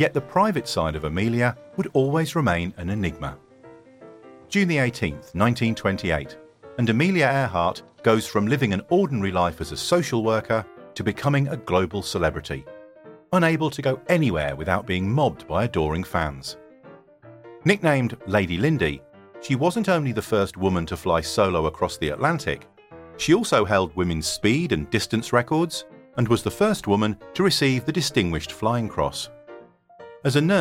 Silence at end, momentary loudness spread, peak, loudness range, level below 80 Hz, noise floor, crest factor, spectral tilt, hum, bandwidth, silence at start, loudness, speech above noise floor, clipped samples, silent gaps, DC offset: 0 s; 8 LU; -4 dBFS; 3 LU; -46 dBFS; -48 dBFS; 20 dB; -5.5 dB/octave; none; 16.5 kHz; 0 s; -23 LUFS; 26 dB; under 0.1%; none; under 0.1%